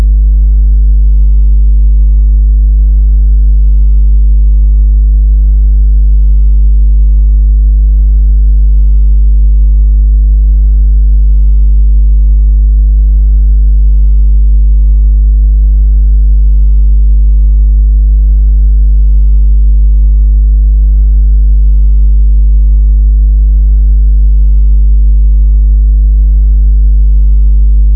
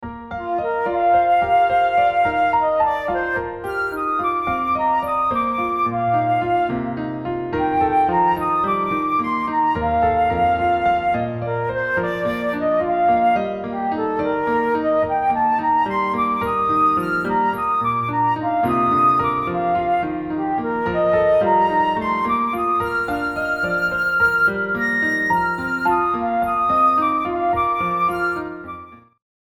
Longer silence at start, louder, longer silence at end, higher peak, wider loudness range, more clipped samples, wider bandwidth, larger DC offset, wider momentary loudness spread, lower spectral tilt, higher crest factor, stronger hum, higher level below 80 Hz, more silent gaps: about the same, 0 s vs 0 s; first, -9 LUFS vs -19 LUFS; second, 0 s vs 0.55 s; first, 0 dBFS vs -6 dBFS; about the same, 0 LU vs 2 LU; neither; second, 0.6 kHz vs 15 kHz; neither; second, 0 LU vs 7 LU; first, -17 dB/octave vs -7 dB/octave; second, 4 dB vs 12 dB; neither; first, -4 dBFS vs -46 dBFS; neither